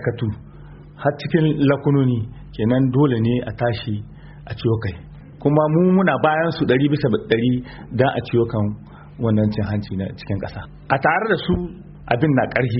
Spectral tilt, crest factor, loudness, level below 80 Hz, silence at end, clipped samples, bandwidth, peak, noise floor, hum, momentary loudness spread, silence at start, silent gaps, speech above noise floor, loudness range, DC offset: -6.5 dB/octave; 18 dB; -20 LUFS; -44 dBFS; 0 s; under 0.1%; 5.8 kHz; -2 dBFS; -40 dBFS; none; 13 LU; 0 s; none; 21 dB; 4 LU; under 0.1%